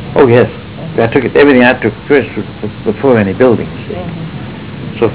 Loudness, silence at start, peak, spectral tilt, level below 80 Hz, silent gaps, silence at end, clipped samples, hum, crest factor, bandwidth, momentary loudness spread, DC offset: -11 LUFS; 0 s; 0 dBFS; -11 dB/octave; -36 dBFS; none; 0 s; under 0.1%; none; 10 dB; 4 kHz; 16 LU; 0.7%